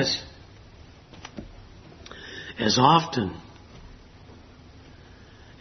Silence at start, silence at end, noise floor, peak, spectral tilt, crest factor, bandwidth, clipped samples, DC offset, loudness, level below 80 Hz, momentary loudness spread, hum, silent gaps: 0 s; 1.65 s; -49 dBFS; -4 dBFS; -4 dB/octave; 26 dB; 6.4 kHz; under 0.1%; under 0.1%; -23 LUFS; -52 dBFS; 29 LU; none; none